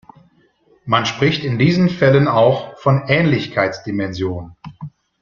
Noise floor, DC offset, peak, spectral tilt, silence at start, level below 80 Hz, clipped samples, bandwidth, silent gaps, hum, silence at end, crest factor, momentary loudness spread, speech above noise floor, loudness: -56 dBFS; under 0.1%; -2 dBFS; -7 dB/octave; 0.85 s; -50 dBFS; under 0.1%; 7.2 kHz; none; none; 0.35 s; 16 dB; 21 LU; 40 dB; -16 LUFS